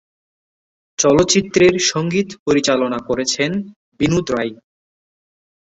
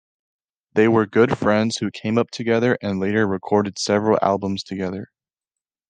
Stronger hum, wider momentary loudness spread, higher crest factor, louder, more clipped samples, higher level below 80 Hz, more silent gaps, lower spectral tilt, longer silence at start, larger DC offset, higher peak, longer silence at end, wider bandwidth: neither; about the same, 10 LU vs 9 LU; about the same, 18 dB vs 18 dB; first, -17 LUFS vs -20 LUFS; neither; first, -46 dBFS vs -64 dBFS; first, 2.39-2.46 s, 3.76-3.92 s vs none; second, -4 dB/octave vs -5.5 dB/octave; first, 1 s vs 0.75 s; neither; about the same, -2 dBFS vs -4 dBFS; first, 1.2 s vs 0.85 s; second, 8.2 kHz vs 9.6 kHz